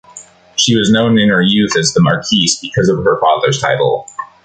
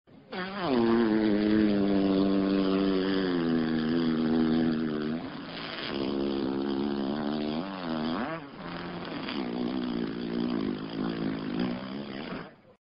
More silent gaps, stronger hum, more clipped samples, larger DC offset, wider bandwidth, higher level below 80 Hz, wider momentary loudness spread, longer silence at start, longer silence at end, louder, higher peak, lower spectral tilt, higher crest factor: neither; neither; neither; neither; first, 9.4 kHz vs 5.6 kHz; first, -46 dBFS vs -56 dBFS; second, 5 LU vs 12 LU; about the same, 0.15 s vs 0.1 s; about the same, 0.2 s vs 0.3 s; first, -12 LUFS vs -29 LUFS; first, 0 dBFS vs -14 dBFS; about the same, -4 dB/octave vs -5 dB/octave; about the same, 12 dB vs 14 dB